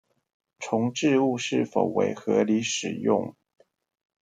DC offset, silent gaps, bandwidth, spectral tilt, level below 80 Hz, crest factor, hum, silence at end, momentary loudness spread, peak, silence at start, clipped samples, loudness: under 0.1%; none; 9.6 kHz; -4.5 dB/octave; -72 dBFS; 20 dB; none; 0.9 s; 5 LU; -8 dBFS; 0.6 s; under 0.1%; -25 LUFS